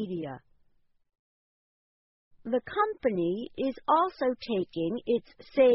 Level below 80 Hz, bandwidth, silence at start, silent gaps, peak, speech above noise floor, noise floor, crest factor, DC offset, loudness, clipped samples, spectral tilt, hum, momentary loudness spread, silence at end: -66 dBFS; 5.8 kHz; 0 s; 1.19-2.31 s; -10 dBFS; 38 dB; -67 dBFS; 20 dB; under 0.1%; -30 LUFS; under 0.1%; -4.5 dB/octave; none; 10 LU; 0 s